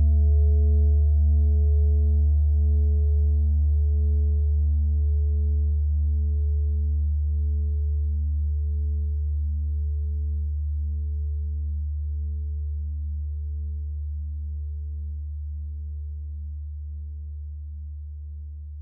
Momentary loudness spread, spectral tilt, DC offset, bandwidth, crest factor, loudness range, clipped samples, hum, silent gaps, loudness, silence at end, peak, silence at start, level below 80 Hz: 15 LU; -16.5 dB/octave; under 0.1%; 0.7 kHz; 10 dB; 13 LU; under 0.1%; none; none; -25 LUFS; 0 s; -14 dBFS; 0 s; -26 dBFS